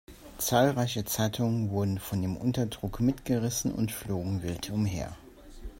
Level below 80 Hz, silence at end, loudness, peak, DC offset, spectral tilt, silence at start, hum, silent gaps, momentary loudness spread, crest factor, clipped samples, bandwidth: -50 dBFS; 0 s; -30 LUFS; -10 dBFS; under 0.1%; -5.5 dB/octave; 0.1 s; none; none; 8 LU; 20 dB; under 0.1%; 16.5 kHz